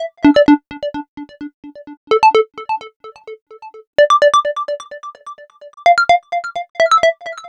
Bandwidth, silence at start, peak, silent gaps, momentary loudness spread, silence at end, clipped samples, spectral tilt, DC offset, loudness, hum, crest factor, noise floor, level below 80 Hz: 10.5 kHz; 0 s; -2 dBFS; 1.08-1.17 s, 1.54-1.63 s, 1.97-2.07 s, 2.96-3.00 s, 3.42-3.46 s, 3.87-3.93 s, 6.70-6.74 s; 22 LU; 0 s; under 0.1%; -4 dB/octave; under 0.1%; -14 LUFS; none; 14 dB; -36 dBFS; -52 dBFS